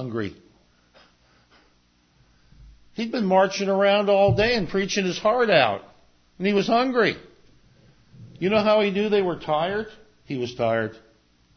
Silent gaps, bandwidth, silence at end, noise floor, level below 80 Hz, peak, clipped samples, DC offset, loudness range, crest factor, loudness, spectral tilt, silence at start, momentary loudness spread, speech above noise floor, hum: none; 6.6 kHz; 0.6 s; -62 dBFS; -52 dBFS; -4 dBFS; under 0.1%; under 0.1%; 6 LU; 20 dB; -22 LUFS; -5.5 dB/octave; 0 s; 13 LU; 40 dB; 60 Hz at -55 dBFS